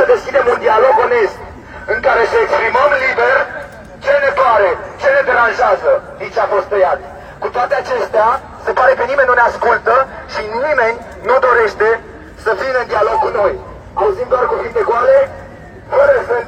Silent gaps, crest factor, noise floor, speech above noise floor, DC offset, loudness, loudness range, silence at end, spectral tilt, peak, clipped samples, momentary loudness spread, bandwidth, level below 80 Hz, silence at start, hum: none; 14 dB; -33 dBFS; 20 dB; under 0.1%; -13 LUFS; 2 LU; 0 s; -4.5 dB/octave; 0 dBFS; under 0.1%; 11 LU; 9.2 kHz; -42 dBFS; 0 s; none